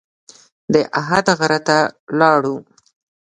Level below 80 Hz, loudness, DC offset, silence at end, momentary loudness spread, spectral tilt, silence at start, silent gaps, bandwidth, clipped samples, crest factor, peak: -58 dBFS; -16 LUFS; under 0.1%; 0.65 s; 6 LU; -4.5 dB/octave; 0.7 s; 2.00-2.07 s; 11 kHz; under 0.1%; 18 dB; 0 dBFS